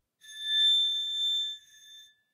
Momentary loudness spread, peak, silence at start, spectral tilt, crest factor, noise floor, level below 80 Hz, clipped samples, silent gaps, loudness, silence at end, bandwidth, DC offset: 18 LU; -18 dBFS; 0.25 s; 6 dB/octave; 12 dB; -54 dBFS; under -90 dBFS; under 0.1%; none; -25 LUFS; 0.3 s; 15.5 kHz; under 0.1%